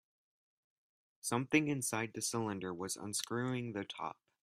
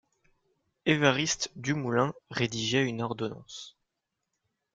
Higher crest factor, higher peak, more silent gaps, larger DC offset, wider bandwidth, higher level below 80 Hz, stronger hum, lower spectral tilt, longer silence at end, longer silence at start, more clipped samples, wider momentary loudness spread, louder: about the same, 24 dB vs 22 dB; second, -16 dBFS vs -8 dBFS; neither; neither; first, 15.5 kHz vs 9.6 kHz; second, -76 dBFS vs -66 dBFS; neither; about the same, -4 dB/octave vs -4 dB/octave; second, 0.3 s vs 1.05 s; first, 1.25 s vs 0.85 s; neither; second, 11 LU vs 17 LU; second, -38 LUFS vs -29 LUFS